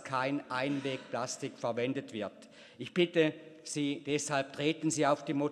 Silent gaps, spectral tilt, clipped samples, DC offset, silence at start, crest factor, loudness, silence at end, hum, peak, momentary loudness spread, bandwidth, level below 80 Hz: none; -4.5 dB/octave; under 0.1%; under 0.1%; 0 s; 20 dB; -33 LUFS; 0 s; none; -14 dBFS; 10 LU; 12.5 kHz; -80 dBFS